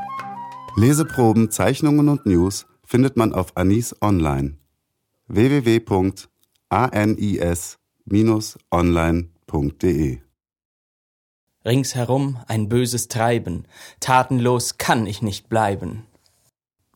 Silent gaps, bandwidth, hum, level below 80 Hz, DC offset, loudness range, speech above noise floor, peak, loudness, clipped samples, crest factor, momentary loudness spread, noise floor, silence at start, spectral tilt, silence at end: 10.65-11.47 s; 18 kHz; none; -40 dBFS; under 0.1%; 5 LU; 55 dB; 0 dBFS; -20 LUFS; under 0.1%; 20 dB; 12 LU; -74 dBFS; 0 s; -6 dB/octave; 0.95 s